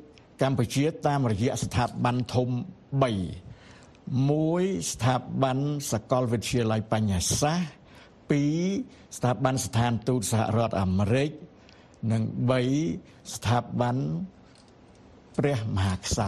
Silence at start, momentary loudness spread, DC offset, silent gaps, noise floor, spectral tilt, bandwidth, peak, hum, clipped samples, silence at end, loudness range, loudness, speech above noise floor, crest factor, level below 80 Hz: 0 s; 8 LU; under 0.1%; none; -54 dBFS; -5.5 dB/octave; 13 kHz; -6 dBFS; none; under 0.1%; 0 s; 2 LU; -27 LUFS; 27 dB; 20 dB; -50 dBFS